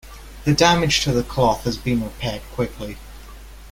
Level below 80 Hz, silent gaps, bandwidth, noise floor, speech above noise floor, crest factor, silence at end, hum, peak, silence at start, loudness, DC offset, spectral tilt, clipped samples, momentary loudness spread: -38 dBFS; none; 16.5 kHz; -39 dBFS; 19 dB; 22 dB; 0 s; none; 0 dBFS; 0.05 s; -20 LUFS; under 0.1%; -4.5 dB/octave; under 0.1%; 19 LU